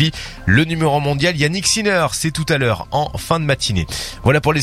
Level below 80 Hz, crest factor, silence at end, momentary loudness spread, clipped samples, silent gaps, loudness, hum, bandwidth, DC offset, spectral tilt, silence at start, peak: -36 dBFS; 16 dB; 0 s; 6 LU; under 0.1%; none; -17 LUFS; none; 15.5 kHz; under 0.1%; -4.5 dB/octave; 0 s; 0 dBFS